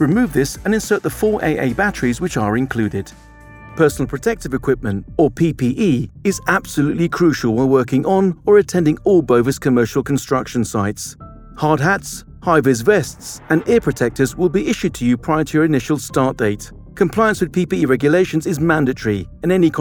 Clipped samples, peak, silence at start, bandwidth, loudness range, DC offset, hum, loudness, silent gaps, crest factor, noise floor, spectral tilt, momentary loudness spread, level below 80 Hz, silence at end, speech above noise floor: under 0.1%; -2 dBFS; 0 s; 20 kHz; 4 LU; under 0.1%; none; -17 LUFS; none; 16 dB; -39 dBFS; -6 dB/octave; 7 LU; -40 dBFS; 0 s; 22 dB